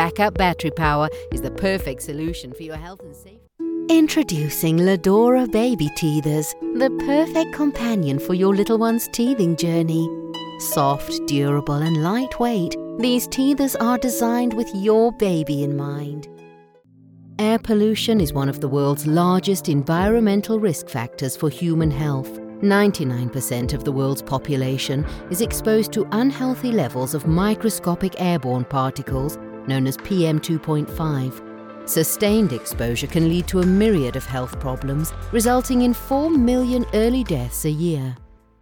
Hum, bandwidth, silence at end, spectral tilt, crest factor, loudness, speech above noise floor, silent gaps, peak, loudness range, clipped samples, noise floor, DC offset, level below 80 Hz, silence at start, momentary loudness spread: none; 19 kHz; 0.35 s; -6 dB/octave; 16 dB; -20 LUFS; 31 dB; none; -4 dBFS; 4 LU; under 0.1%; -51 dBFS; under 0.1%; -38 dBFS; 0 s; 10 LU